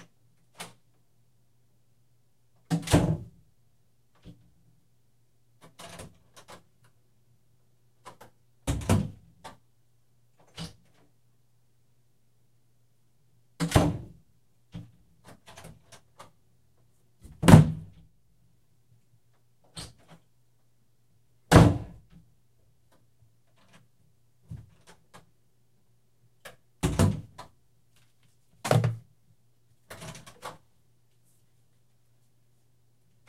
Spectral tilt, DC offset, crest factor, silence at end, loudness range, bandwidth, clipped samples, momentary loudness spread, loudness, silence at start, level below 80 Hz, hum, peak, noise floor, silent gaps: -6.5 dB/octave; under 0.1%; 32 dB; 2.8 s; 24 LU; 15.5 kHz; under 0.1%; 32 LU; -24 LUFS; 0.6 s; -46 dBFS; none; 0 dBFS; -70 dBFS; none